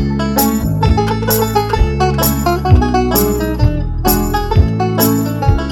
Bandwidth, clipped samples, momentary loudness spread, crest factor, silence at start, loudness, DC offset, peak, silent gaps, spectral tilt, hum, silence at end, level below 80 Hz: 19.5 kHz; under 0.1%; 3 LU; 12 dB; 0 s; -14 LUFS; 0.2%; 0 dBFS; none; -5.5 dB/octave; none; 0 s; -20 dBFS